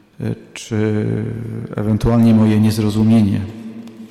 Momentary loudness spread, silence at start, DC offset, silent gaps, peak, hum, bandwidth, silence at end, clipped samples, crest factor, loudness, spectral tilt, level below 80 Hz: 17 LU; 0.2 s; under 0.1%; none; -6 dBFS; none; 13.5 kHz; 0.05 s; under 0.1%; 10 dB; -16 LUFS; -7.5 dB/octave; -38 dBFS